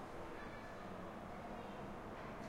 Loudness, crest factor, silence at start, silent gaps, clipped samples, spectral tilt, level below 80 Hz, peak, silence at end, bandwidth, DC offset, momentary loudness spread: -50 LUFS; 12 dB; 0 s; none; under 0.1%; -6 dB/octave; -62 dBFS; -38 dBFS; 0 s; 16 kHz; under 0.1%; 1 LU